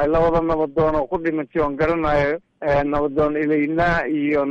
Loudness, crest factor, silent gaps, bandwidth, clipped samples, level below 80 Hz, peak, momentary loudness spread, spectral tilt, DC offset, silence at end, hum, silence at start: -20 LUFS; 10 dB; none; 7.2 kHz; under 0.1%; -36 dBFS; -10 dBFS; 4 LU; -8 dB/octave; under 0.1%; 0 s; none; 0 s